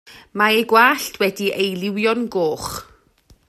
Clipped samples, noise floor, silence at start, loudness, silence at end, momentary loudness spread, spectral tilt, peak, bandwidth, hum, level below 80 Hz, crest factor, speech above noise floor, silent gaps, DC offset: under 0.1%; -54 dBFS; 0.1 s; -18 LUFS; 0.65 s; 14 LU; -3.5 dB/octave; 0 dBFS; 14.5 kHz; none; -54 dBFS; 18 dB; 36 dB; none; under 0.1%